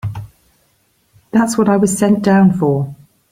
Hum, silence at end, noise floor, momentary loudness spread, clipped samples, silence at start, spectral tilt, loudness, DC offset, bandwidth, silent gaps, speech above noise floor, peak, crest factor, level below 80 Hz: none; 0.35 s; -59 dBFS; 15 LU; under 0.1%; 0.05 s; -6.5 dB/octave; -14 LUFS; under 0.1%; 15.5 kHz; none; 47 dB; -2 dBFS; 14 dB; -48 dBFS